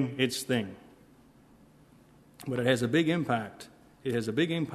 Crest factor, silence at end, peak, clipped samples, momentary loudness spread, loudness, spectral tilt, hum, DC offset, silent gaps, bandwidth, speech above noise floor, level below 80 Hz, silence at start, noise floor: 22 dB; 0 s; -10 dBFS; under 0.1%; 17 LU; -29 LUFS; -5.5 dB/octave; none; under 0.1%; none; 13.5 kHz; 29 dB; -68 dBFS; 0 s; -58 dBFS